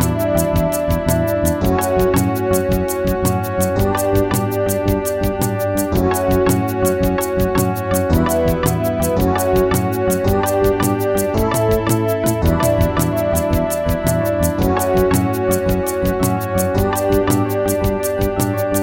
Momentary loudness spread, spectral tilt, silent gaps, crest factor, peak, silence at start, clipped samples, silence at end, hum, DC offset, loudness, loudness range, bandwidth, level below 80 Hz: 3 LU; -6 dB/octave; none; 16 dB; 0 dBFS; 0 s; under 0.1%; 0 s; none; 0.2%; -17 LUFS; 1 LU; 17 kHz; -28 dBFS